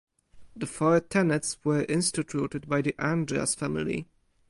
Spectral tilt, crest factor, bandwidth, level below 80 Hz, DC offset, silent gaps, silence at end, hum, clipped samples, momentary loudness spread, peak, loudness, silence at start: -5 dB/octave; 18 dB; 11.5 kHz; -58 dBFS; under 0.1%; none; 0.45 s; none; under 0.1%; 8 LU; -10 dBFS; -28 LUFS; 0.35 s